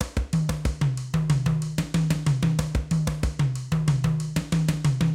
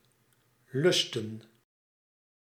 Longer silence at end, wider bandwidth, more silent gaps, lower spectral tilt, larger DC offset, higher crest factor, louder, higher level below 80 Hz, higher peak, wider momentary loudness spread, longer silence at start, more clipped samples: second, 0 s vs 1.1 s; about the same, 15.5 kHz vs 15.5 kHz; neither; first, -6.5 dB/octave vs -4 dB/octave; neither; second, 14 dB vs 20 dB; first, -25 LUFS vs -28 LUFS; first, -34 dBFS vs -82 dBFS; first, -10 dBFS vs -14 dBFS; second, 4 LU vs 17 LU; second, 0 s vs 0.75 s; neither